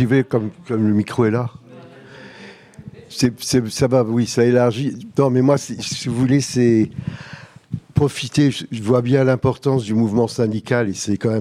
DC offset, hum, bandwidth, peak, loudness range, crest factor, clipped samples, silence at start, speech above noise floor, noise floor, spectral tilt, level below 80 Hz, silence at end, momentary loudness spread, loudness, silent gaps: under 0.1%; none; 15 kHz; -2 dBFS; 4 LU; 16 dB; under 0.1%; 0 s; 24 dB; -41 dBFS; -6 dB/octave; -50 dBFS; 0 s; 14 LU; -18 LUFS; none